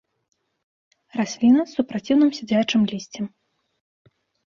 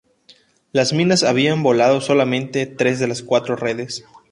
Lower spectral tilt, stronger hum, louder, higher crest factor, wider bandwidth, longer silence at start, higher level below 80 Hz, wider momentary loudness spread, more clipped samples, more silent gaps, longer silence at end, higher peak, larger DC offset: about the same, -5.5 dB/octave vs -5 dB/octave; neither; second, -21 LUFS vs -18 LUFS; about the same, 16 dB vs 16 dB; second, 7.4 kHz vs 11.5 kHz; first, 1.15 s vs 0.75 s; about the same, -64 dBFS vs -60 dBFS; first, 15 LU vs 9 LU; neither; neither; first, 1.2 s vs 0.3 s; second, -8 dBFS vs -2 dBFS; neither